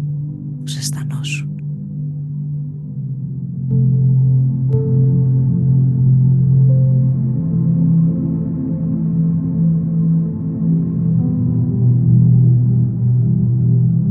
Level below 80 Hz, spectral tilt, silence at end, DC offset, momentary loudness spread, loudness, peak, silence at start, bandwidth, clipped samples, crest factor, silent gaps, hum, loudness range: -40 dBFS; -8.5 dB/octave; 0 s; under 0.1%; 12 LU; -16 LUFS; -2 dBFS; 0 s; 12 kHz; under 0.1%; 12 dB; none; none; 7 LU